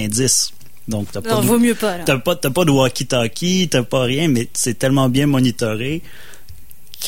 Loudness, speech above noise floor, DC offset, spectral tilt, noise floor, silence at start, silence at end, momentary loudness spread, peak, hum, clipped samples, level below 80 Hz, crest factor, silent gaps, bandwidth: -17 LUFS; 25 dB; 3%; -4.5 dB/octave; -42 dBFS; 0 s; 0 s; 9 LU; -2 dBFS; none; under 0.1%; -44 dBFS; 16 dB; none; 17 kHz